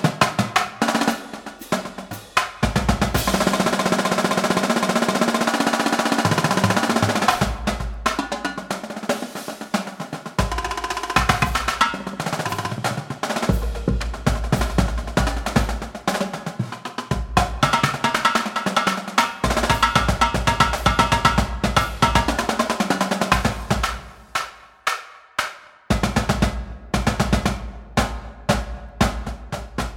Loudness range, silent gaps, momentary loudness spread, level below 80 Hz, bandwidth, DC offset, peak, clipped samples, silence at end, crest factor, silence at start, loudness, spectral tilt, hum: 5 LU; none; 10 LU; -32 dBFS; 18 kHz; under 0.1%; 0 dBFS; under 0.1%; 0 s; 20 dB; 0 s; -21 LUFS; -4.5 dB/octave; none